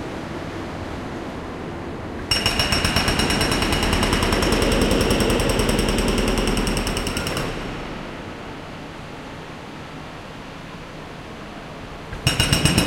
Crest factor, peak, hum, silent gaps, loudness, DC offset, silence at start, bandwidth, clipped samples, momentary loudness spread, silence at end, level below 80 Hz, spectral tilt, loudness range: 22 dB; -2 dBFS; none; none; -21 LUFS; under 0.1%; 0 s; 17 kHz; under 0.1%; 16 LU; 0 s; -30 dBFS; -4 dB/octave; 16 LU